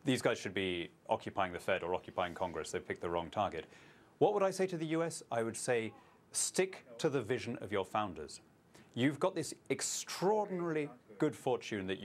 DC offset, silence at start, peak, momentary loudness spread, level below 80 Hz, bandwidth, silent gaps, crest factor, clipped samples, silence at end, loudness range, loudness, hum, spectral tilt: under 0.1%; 0.05 s; -16 dBFS; 8 LU; -72 dBFS; 15.5 kHz; none; 20 dB; under 0.1%; 0 s; 2 LU; -37 LUFS; none; -4 dB/octave